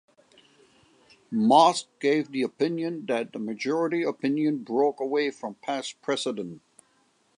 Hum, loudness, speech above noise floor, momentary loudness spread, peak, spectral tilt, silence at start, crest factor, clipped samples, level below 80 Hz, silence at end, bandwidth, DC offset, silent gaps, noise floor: none; -26 LUFS; 41 dB; 12 LU; -6 dBFS; -4.5 dB/octave; 1.3 s; 22 dB; under 0.1%; -80 dBFS; 0.8 s; 11 kHz; under 0.1%; none; -66 dBFS